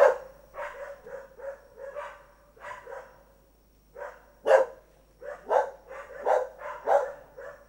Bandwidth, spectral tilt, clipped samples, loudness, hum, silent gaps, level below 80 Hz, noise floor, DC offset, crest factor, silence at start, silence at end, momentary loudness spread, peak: 16 kHz; -3 dB/octave; under 0.1%; -28 LUFS; none; none; -62 dBFS; -61 dBFS; under 0.1%; 24 dB; 0 s; 0.15 s; 21 LU; -6 dBFS